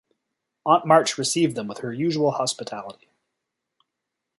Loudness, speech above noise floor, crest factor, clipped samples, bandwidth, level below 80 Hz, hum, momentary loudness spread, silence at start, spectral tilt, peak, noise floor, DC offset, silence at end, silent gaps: -22 LUFS; 61 dB; 22 dB; under 0.1%; 12 kHz; -70 dBFS; none; 16 LU; 0.65 s; -4 dB/octave; -2 dBFS; -83 dBFS; under 0.1%; 1.45 s; none